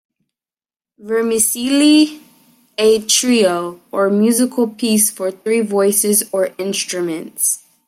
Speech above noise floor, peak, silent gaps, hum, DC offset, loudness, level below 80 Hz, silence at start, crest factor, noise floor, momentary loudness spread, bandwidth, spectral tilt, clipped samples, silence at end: over 75 dB; 0 dBFS; none; none; under 0.1%; -15 LUFS; -64 dBFS; 1 s; 16 dB; under -90 dBFS; 9 LU; 16.5 kHz; -3 dB/octave; under 0.1%; 0.3 s